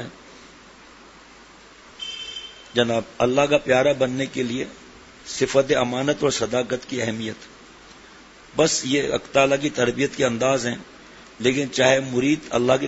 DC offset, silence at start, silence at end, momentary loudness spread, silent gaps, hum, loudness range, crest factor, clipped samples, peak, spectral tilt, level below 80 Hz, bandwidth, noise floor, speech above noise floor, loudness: under 0.1%; 0 s; 0 s; 14 LU; none; none; 3 LU; 22 dB; under 0.1%; -2 dBFS; -4 dB/octave; -54 dBFS; 8 kHz; -47 dBFS; 26 dB; -22 LUFS